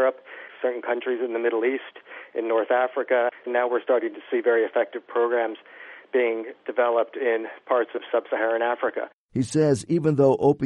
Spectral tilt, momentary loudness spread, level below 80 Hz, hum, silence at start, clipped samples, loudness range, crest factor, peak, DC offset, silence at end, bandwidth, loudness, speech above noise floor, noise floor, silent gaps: -6.5 dB/octave; 10 LU; -66 dBFS; none; 0 s; under 0.1%; 2 LU; 16 dB; -8 dBFS; under 0.1%; 0 s; 11 kHz; -24 LUFS; 19 dB; -43 dBFS; 9.13-9.29 s